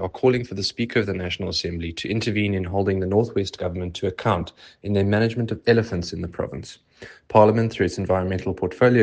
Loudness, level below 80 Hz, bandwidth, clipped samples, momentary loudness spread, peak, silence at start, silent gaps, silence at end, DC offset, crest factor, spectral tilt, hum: -23 LUFS; -52 dBFS; 9.2 kHz; under 0.1%; 11 LU; 0 dBFS; 0 s; none; 0 s; under 0.1%; 22 dB; -6.5 dB/octave; none